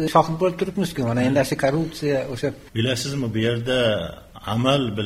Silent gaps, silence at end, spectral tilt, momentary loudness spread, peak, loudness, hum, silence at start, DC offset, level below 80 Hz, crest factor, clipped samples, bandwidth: none; 0 s; -5.5 dB/octave; 7 LU; -2 dBFS; -22 LUFS; none; 0 s; under 0.1%; -48 dBFS; 20 dB; under 0.1%; 16 kHz